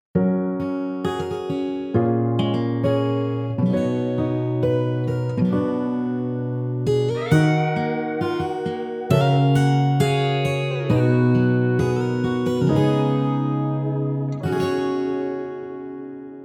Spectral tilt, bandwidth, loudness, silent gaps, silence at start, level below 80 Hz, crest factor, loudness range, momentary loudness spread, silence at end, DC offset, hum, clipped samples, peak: -8 dB/octave; 12 kHz; -22 LUFS; none; 0.15 s; -52 dBFS; 16 dB; 3 LU; 8 LU; 0 s; under 0.1%; none; under 0.1%; -6 dBFS